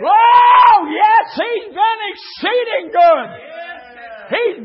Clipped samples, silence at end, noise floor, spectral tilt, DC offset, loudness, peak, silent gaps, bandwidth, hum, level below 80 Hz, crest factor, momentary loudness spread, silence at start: under 0.1%; 0 s; -34 dBFS; -5.5 dB/octave; under 0.1%; -12 LUFS; 0 dBFS; none; 5.8 kHz; none; -60 dBFS; 14 dB; 23 LU; 0 s